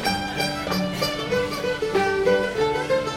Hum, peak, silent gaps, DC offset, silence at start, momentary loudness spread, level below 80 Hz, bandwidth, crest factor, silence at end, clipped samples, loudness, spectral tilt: none; -8 dBFS; none; under 0.1%; 0 s; 4 LU; -46 dBFS; 16.5 kHz; 14 dB; 0 s; under 0.1%; -23 LUFS; -4.5 dB/octave